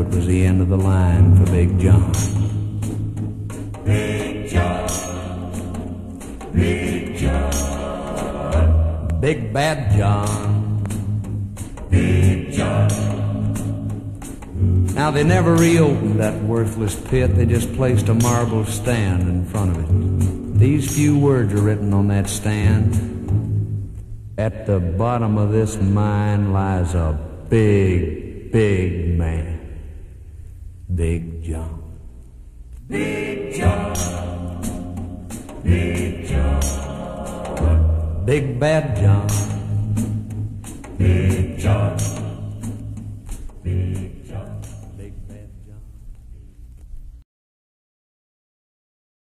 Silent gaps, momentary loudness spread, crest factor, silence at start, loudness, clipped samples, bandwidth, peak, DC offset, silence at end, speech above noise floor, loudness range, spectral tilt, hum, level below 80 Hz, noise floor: none; 16 LU; 16 dB; 0 s; -20 LUFS; under 0.1%; 14 kHz; -2 dBFS; under 0.1%; 2.05 s; 23 dB; 9 LU; -6.5 dB/octave; none; -30 dBFS; -40 dBFS